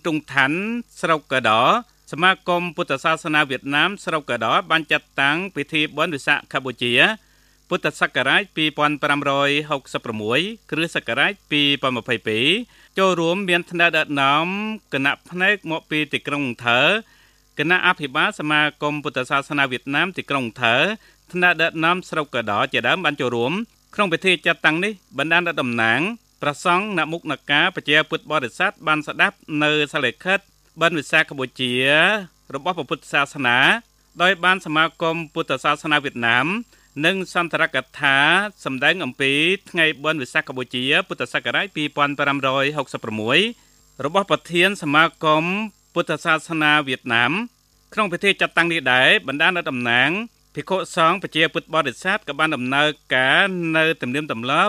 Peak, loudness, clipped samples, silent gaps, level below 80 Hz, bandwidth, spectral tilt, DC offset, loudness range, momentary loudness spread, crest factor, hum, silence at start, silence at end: 0 dBFS; -19 LUFS; under 0.1%; none; -62 dBFS; 14.5 kHz; -4 dB/octave; under 0.1%; 2 LU; 9 LU; 20 dB; none; 0.05 s; 0 s